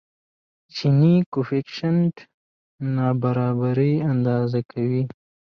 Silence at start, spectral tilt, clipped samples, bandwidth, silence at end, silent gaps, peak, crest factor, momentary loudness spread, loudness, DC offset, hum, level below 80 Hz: 0.75 s; -9 dB/octave; under 0.1%; 6.6 kHz; 0.4 s; 1.26-1.32 s, 2.34-2.78 s; -8 dBFS; 14 dB; 8 LU; -22 LUFS; under 0.1%; none; -62 dBFS